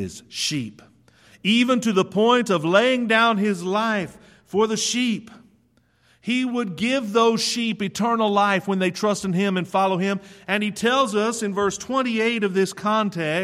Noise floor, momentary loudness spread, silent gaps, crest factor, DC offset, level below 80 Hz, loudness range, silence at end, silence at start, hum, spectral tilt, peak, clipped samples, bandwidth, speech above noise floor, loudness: -62 dBFS; 8 LU; none; 18 dB; under 0.1%; -64 dBFS; 4 LU; 0 s; 0 s; none; -4 dB/octave; -4 dBFS; under 0.1%; 14.5 kHz; 41 dB; -21 LUFS